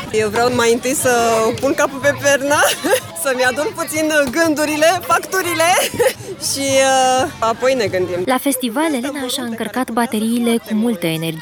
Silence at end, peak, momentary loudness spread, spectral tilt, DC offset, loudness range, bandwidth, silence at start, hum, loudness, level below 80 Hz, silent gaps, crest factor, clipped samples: 0 s; -2 dBFS; 6 LU; -3 dB/octave; under 0.1%; 3 LU; over 20 kHz; 0 s; none; -16 LUFS; -52 dBFS; none; 14 dB; under 0.1%